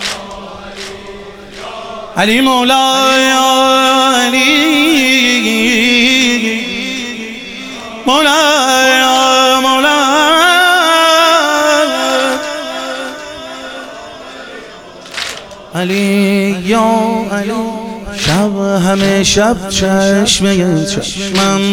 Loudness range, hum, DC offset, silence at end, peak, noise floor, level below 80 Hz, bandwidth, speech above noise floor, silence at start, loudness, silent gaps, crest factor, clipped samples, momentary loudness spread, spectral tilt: 9 LU; none; 0.2%; 0 s; 0 dBFS; -32 dBFS; -40 dBFS; 19.5 kHz; 21 dB; 0 s; -10 LUFS; none; 12 dB; under 0.1%; 18 LU; -3 dB/octave